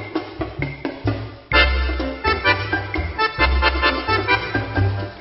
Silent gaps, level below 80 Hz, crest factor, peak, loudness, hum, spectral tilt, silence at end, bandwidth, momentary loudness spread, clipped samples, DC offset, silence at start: none; -28 dBFS; 18 dB; -2 dBFS; -20 LUFS; none; -8.5 dB/octave; 0 s; 5.8 kHz; 10 LU; under 0.1%; under 0.1%; 0 s